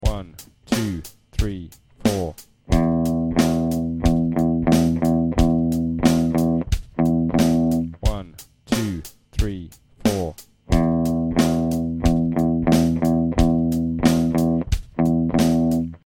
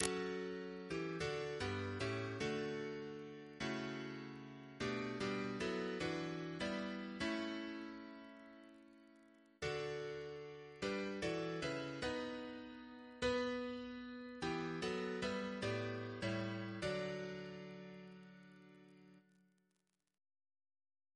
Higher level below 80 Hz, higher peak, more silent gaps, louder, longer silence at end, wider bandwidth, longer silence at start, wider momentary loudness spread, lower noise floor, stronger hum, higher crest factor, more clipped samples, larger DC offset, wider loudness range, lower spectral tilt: first, -30 dBFS vs -68 dBFS; first, -2 dBFS vs -14 dBFS; neither; first, -21 LUFS vs -44 LUFS; second, 0.1 s vs 1.95 s; first, 17 kHz vs 11 kHz; about the same, 0 s vs 0 s; second, 9 LU vs 14 LU; second, -43 dBFS vs -86 dBFS; neither; second, 18 dB vs 30 dB; neither; neither; about the same, 4 LU vs 6 LU; first, -6.5 dB/octave vs -5 dB/octave